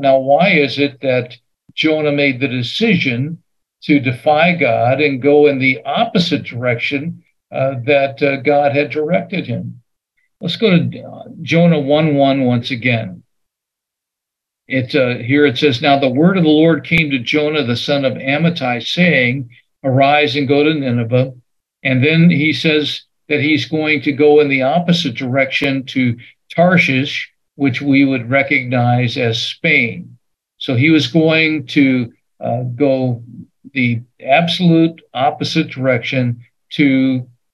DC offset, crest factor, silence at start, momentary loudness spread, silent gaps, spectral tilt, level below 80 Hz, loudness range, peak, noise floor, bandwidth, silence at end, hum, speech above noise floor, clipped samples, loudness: under 0.1%; 14 dB; 0 s; 11 LU; none; -7 dB/octave; -58 dBFS; 3 LU; 0 dBFS; -82 dBFS; 11.5 kHz; 0.3 s; none; 68 dB; under 0.1%; -14 LUFS